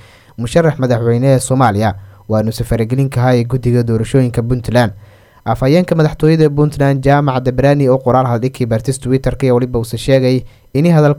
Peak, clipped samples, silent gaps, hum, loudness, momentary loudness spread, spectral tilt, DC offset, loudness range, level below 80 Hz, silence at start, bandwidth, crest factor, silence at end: 0 dBFS; under 0.1%; none; none; -13 LUFS; 7 LU; -7 dB/octave; under 0.1%; 2 LU; -34 dBFS; 0.4 s; 15 kHz; 12 dB; 0 s